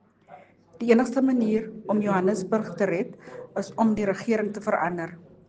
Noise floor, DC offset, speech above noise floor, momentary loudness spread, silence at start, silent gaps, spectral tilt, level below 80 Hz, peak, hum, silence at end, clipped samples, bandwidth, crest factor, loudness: -51 dBFS; under 0.1%; 26 dB; 12 LU; 0.3 s; none; -7 dB/octave; -62 dBFS; -6 dBFS; none; 0.3 s; under 0.1%; 9.4 kHz; 20 dB; -25 LUFS